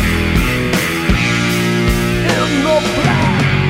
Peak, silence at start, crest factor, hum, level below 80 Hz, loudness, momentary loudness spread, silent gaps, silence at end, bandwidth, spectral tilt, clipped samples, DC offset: -2 dBFS; 0 s; 12 dB; none; -24 dBFS; -14 LUFS; 2 LU; none; 0 s; 16.5 kHz; -5 dB/octave; under 0.1%; under 0.1%